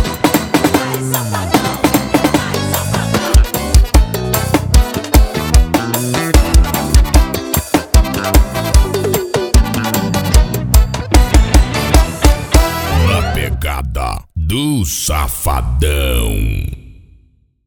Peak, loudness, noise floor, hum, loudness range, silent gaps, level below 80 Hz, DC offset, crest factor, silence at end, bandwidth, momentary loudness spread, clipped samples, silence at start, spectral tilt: 0 dBFS; -14 LUFS; -51 dBFS; none; 4 LU; none; -14 dBFS; under 0.1%; 12 dB; 0.75 s; over 20 kHz; 6 LU; 0.1%; 0 s; -5 dB/octave